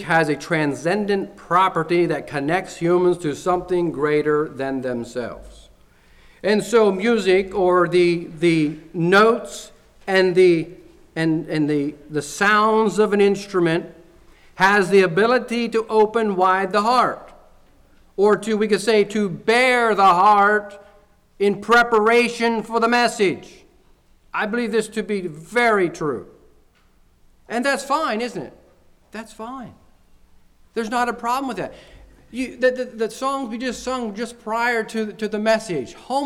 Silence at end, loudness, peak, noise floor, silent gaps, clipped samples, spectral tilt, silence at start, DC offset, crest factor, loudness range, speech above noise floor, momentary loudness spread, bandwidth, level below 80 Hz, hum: 0 s; -19 LUFS; -6 dBFS; -56 dBFS; none; under 0.1%; -5 dB/octave; 0 s; under 0.1%; 14 dB; 10 LU; 37 dB; 14 LU; 14.5 kHz; -52 dBFS; none